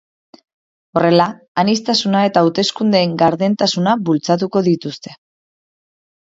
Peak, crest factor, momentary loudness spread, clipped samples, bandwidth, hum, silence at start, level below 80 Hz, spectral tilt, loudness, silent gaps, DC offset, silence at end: 0 dBFS; 16 dB; 7 LU; under 0.1%; 7.8 kHz; none; 0.95 s; -60 dBFS; -5.5 dB/octave; -15 LUFS; 1.48-1.55 s; under 0.1%; 1.05 s